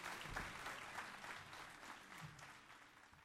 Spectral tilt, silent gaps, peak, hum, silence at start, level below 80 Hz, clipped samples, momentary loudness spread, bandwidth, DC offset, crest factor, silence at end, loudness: -2.5 dB/octave; none; -32 dBFS; none; 0 s; -68 dBFS; under 0.1%; 12 LU; 16 kHz; under 0.1%; 22 dB; 0 s; -52 LUFS